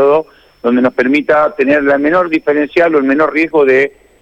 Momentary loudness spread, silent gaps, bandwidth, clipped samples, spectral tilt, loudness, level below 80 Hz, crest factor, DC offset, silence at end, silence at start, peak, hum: 3 LU; none; 8 kHz; under 0.1%; -6.5 dB/octave; -12 LUFS; -50 dBFS; 10 dB; under 0.1%; 0.35 s; 0 s; -2 dBFS; none